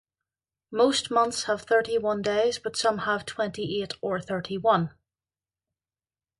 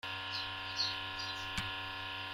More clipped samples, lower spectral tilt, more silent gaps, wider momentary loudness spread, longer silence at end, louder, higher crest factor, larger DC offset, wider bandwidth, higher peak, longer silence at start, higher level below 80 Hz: neither; first, -4 dB/octave vs -2 dB/octave; neither; first, 8 LU vs 5 LU; first, 1.5 s vs 0 s; first, -26 LUFS vs -38 LUFS; about the same, 20 dB vs 18 dB; neither; second, 11.5 kHz vs 16 kHz; first, -8 dBFS vs -22 dBFS; first, 0.7 s vs 0.05 s; about the same, -64 dBFS vs -60 dBFS